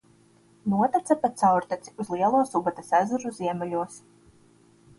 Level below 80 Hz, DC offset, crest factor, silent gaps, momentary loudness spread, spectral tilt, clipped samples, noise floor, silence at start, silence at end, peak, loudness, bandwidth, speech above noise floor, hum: -66 dBFS; under 0.1%; 18 dB; none; 11 LU; -6.5 dB/octave; under 0.1%; -59 dBFS; 0.65 s; 1 s; -8 dBFS; -25 LUFS; 11.5 kHz; 34 dB; none